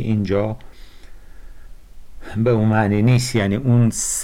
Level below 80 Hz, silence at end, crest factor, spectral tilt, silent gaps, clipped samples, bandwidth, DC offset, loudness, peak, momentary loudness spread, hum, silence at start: -40 dBFS; 0 s; 10 dB; -6 dB/octave; none; under 0.1%; 15 kHz; under 0.1%; -18 LUFS; -8 dBFS; 9 LU; none; 0 s